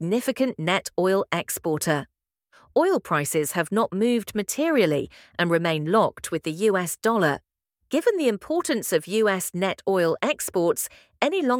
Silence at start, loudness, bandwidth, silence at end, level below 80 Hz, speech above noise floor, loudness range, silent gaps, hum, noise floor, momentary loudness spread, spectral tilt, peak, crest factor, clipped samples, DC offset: 0 s; -24 LUFS; 19.5 kHz; 0 s; -64 dBFS; 37 dB; 1 LU; none; none; -60 dBFS; 5 LU; -4.5 dB/octave; -2 dBFS; 20 dB; under 0.1%; under 0.1%